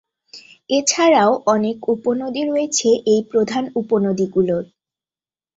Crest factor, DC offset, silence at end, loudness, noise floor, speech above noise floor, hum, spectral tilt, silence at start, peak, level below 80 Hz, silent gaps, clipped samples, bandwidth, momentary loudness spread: 16 dB; under 0.1%; 0.95 s; -18 LUFS; under -90 dBFS; over 73 dB; none; -4 dB/octave; 0.35 s; -2 dBFS; -60 dBFS; none; under 0.1%; 8.2 kHz; 8 LU